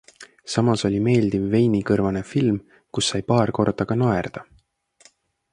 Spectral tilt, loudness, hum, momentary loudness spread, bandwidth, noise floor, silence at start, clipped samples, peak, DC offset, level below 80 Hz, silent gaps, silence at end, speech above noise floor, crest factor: -6 dB/octave; -21 LUFS; none; 9 LU; 11 kHz; -59 dBFS; 0.2 s; under 0.1%; -4 dBFS; under 0.1%; -50 dBFS; none; 1.1 s; 39 dB; 18 dB